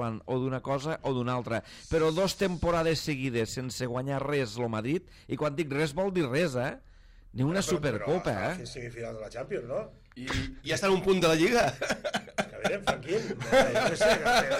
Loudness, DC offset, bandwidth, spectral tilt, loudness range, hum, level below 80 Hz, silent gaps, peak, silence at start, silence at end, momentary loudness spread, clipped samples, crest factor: -29 LUFS; under 0.1%; 16 kHz; -5 dB/octave; 5 LU; none; -50 dBFS; none; -12 dBFS; 0 s; 0 s; 12 LU; under 0.1%; 18 dB